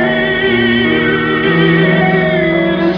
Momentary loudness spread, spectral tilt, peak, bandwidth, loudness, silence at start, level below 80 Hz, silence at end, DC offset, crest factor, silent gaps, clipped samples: 3 LU; -8.5 dB/octave; 0 dBFS; 5.4 kHz; -11 LUFS; 0 s; -38 dBFS; 0 s; under 0.1%; 12 dB; none; under 0.1%